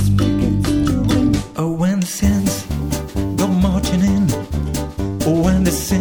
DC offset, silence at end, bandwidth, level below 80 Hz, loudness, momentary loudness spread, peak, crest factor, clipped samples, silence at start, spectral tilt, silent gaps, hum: 0.6%; 0 s; 19.5 kHz; -28 dBFS; -18 LUFS; 7 LU; -2 dBFS; 14 dB; under 0.1%; 0 s; -6 dB/octave; none; none